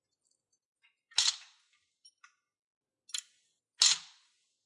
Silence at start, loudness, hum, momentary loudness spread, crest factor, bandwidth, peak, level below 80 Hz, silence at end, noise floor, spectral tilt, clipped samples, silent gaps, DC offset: 1.15 s; -29 LUFS; none; 15 LU; 28 dB; 11.5 kHz; -10 dBFS; -82 dBFS; 0.65 s; -81 dBFS; 5 dB/octave; under 0.1%; 2.62-2.81 s; under 0.1%